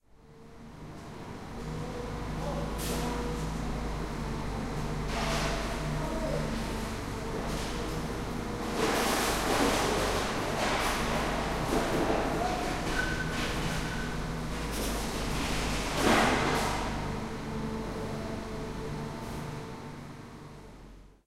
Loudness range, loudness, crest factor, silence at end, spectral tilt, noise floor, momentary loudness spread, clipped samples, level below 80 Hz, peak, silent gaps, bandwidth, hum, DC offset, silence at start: 8 LU; -32 LUFS; 18 dB; 0.15 s; -4.5 dB/octave; -53 dBFS; 15 LU; under 0.1%; -40 dBFS; -14 dBFS; none; 16 kHz; none; under 0.1%; 0.15 s